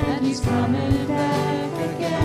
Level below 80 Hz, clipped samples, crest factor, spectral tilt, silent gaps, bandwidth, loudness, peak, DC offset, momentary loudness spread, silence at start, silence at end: -40 dBFS; under 0.1%; 14 dB; -6.5 dB/octave; none; 15.5 kHz; -22 LUFS; -8 dBFS; under 0.1%; 4 LU; 0 s; 0 s